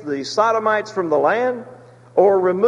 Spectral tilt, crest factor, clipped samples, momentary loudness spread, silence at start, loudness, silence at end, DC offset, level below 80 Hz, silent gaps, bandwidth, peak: -5 dB/octave; 16 dB; under 0.1%; 7 LU; 0 s; -18 LUFS; 0 s; under 0.1%; -66 dBFS; none; 10 kHz; -2 dBFS